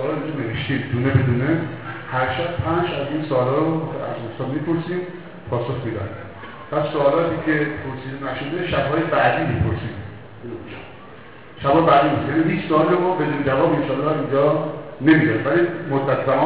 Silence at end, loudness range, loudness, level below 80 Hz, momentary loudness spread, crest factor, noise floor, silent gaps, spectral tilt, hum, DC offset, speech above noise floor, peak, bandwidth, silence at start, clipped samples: 0 s; 5 LU; -20 LUFS; -44 dBFS; 17 LU; 16 dB; -41 dBFS; none; -11 dB/octave; none; 0.6%; 22 dB; -4 dBFS; 4 kHz; 0 s; under 0.1%